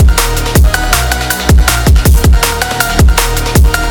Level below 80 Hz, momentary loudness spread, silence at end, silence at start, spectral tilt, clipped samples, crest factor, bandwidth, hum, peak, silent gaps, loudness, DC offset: -10 dBFS; 4 LU; 0 s; 0 s; -4 dB/octave; 0.9%; 8 dB; 20 kHz; none; 0 dBFS; none; -10 LUFS; under 0.1%